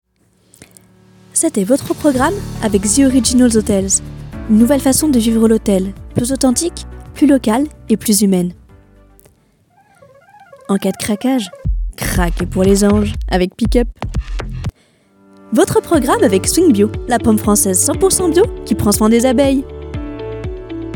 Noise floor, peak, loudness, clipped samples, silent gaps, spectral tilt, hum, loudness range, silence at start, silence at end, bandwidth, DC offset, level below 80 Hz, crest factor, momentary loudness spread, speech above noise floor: -56 dBFS; 0 dBFS; -14 LUFS; under 0.1%; none; -4.5 dB/octave; none; 7 LU; 1.35 s; 0 s; 17.5 kHz; under 0.1%; -28 dBFS; 14 dB; 14 LU; 43 dB